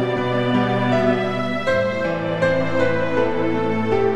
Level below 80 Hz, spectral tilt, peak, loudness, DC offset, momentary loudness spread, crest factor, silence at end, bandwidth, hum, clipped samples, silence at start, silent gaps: -48 dBFS; -7 dB/octave; -6 dBFS; -20 LUFS; under 0.1%; 3 LU; 14 dB; 0 s; 10 kHz; none; under 0.1%; 0 s; none